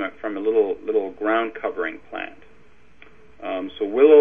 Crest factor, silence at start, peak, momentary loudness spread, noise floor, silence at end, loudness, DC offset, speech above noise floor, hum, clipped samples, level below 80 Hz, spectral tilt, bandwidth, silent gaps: 18 dB; 0 s; -4 dBFS; 14 LU; -55 dBFS; 0 s; -23 LUFS; 0.5%; 36 dB; none; under 0.1%; -60 dBFS; -7 dB/octave; 3.7 kHz; none